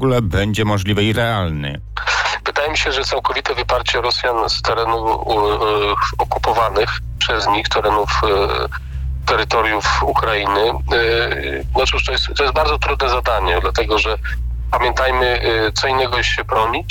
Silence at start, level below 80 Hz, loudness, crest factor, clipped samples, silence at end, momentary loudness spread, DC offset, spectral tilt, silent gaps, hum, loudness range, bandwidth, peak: 0 s; -26 dBFS; -17 LUFS; 10 dB; under 0.1%; 0 s; 4 LU; under 0.1%; -4.5 dB/octave; none; none; 1 LU; 17.5 kHz; -6 dBFS